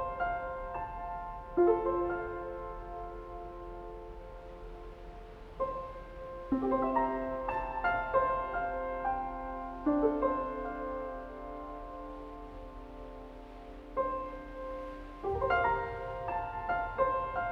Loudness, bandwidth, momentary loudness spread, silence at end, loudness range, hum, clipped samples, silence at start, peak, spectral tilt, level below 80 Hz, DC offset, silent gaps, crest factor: -35 LUFS; 6.6 kHz; 18 LU; 0 s; 11 LU; none; under 0.1%; 0 s; -16 dBFS; -8 dB/octave; -48 dBFS; under 0.1%; none; 20 dB